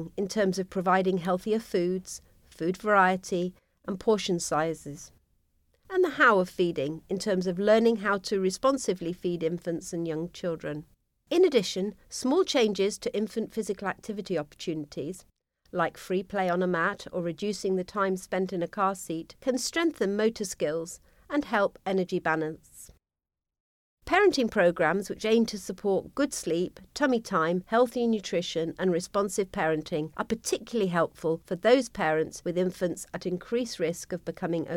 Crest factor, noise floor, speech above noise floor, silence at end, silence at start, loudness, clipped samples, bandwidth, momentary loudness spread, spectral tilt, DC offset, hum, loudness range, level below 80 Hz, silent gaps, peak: 20 dB; under -90 dBFS; over 62 dB; 0 s; 0 s; -28 LUFS; under 0.1%; 16.5 kHz; 11 LU; -5 dB/octave; under 0.1%; none; 4 LU; -60 dBFS; 23.60-23.97 s; -8 dBFS